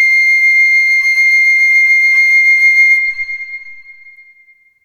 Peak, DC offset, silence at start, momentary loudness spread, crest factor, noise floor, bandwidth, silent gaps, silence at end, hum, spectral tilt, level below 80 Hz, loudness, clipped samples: -2 dBFS; under 0.1%; 0 s; 13 LU; 8 dB; -48 dBFS; 13.5 kHz; none; 0.95 s; none; 5.5 dB/octave; -58 dBFS; -7 LUFS; under 0.1%